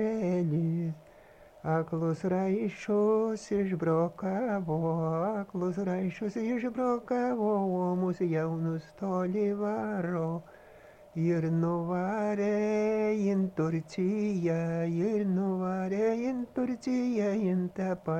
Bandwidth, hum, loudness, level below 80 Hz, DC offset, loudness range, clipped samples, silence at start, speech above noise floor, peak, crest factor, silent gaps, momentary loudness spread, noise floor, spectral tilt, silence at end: 8.8 kHz; none; -31 LUFS; -64 dBFS; under 0.1%; 2 LU; under 0.1%; 0 s; 26 dB; -16 dBFS; 14 dB; none; 5 LU; -55 dBFS; -8.5 dB/octave; 0 s